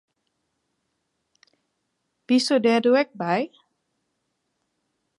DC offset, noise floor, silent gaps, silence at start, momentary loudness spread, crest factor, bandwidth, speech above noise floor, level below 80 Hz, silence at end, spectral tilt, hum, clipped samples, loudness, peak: under 0.1%; -76 dBFS; none; 2.3 s; 7 LU; 18 dB; 11.5 kHz; 56 dB; -82 dBFS; 1.7 s; -4.5 dB/octave; none; under 0.1%; -21 LUFS; -8 dBFS